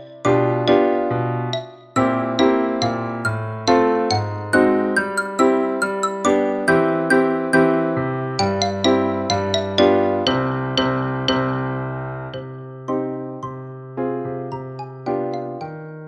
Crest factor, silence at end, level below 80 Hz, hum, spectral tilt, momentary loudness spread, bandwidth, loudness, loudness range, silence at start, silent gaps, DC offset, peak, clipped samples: 18 dB; 0 s; -54 dBFS; none; -5.5 dB/octave; 14 LU; 13.5 kHz; -20 LUFS; 9 LU; 0 s; none; under 0.1%; -2 dBFS; under 0.1%